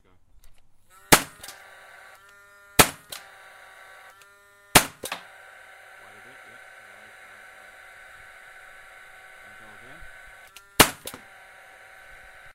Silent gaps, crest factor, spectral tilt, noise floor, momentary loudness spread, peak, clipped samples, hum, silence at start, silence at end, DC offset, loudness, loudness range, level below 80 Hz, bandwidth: none; 30 dB; -2 dB/octave; -55 dBFS; 28 LU; 0 dBFS; under 0.1%; none; 1.1 s; 1.45 s; under 0.1%; -21 LUFS; 21 LU; -50 dBFS; 16 kHz